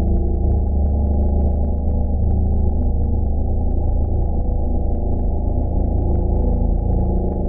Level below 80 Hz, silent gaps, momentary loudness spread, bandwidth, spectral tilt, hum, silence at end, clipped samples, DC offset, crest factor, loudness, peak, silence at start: -18 dBFS; none; 3 LU; 1.1 kHz; -16 dB/octave; none; 0 s; under 0.1%; under 0.1%; 10 dB; -21 LUFS; -6 dBFS; 0 s